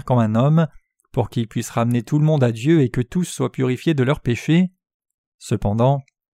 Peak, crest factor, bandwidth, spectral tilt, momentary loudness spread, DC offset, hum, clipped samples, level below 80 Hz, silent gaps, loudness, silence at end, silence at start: -4 dBFS; 14 dB; 14.5 kHz; -7 dB/octave; 8 LU; under 0.1%; none; under 0.1%; -44 dBFS; 4.94-5.00 s, 5.14-5.39 s; -20 LUFS; 0.35 s; 0.05 s